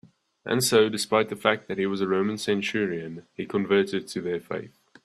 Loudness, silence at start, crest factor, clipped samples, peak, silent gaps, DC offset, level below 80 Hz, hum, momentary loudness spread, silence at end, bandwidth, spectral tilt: -25 LUFS; 0.45 s; 22 dB; under 0.1%; -4 dBFS; none; under 0.1%; -68 dBFS; none; 14 LU; 0.35 s; 13.5 kHz; -4 dB/octave